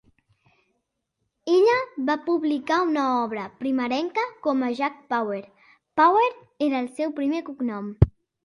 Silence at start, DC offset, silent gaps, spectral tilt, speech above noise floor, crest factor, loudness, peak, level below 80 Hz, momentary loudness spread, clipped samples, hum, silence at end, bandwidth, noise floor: 1.45 s; under 0.1%; none; -7.5 dB/octave; 55 dB; 24 dB; -24 LUFS; 0 dBFS; -42 dBFS; 11 LU; under 0.1%; none; 0.35 s; 11.5 kHz; -78 dBFS